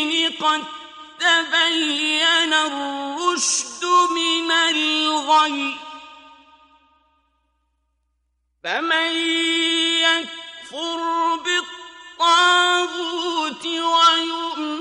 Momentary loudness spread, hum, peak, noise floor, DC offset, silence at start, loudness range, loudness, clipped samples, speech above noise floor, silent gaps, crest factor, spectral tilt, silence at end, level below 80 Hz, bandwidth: 16 LU; none; -4 dBFS; -71 dBFS; under 0.1%; 0 s; 7 LU; -18 LUFS; under 0.1%; 51 dB; none; 18 dB; 0.5 dB/octave; 0 s; -68 dBFS; 11.5 kHz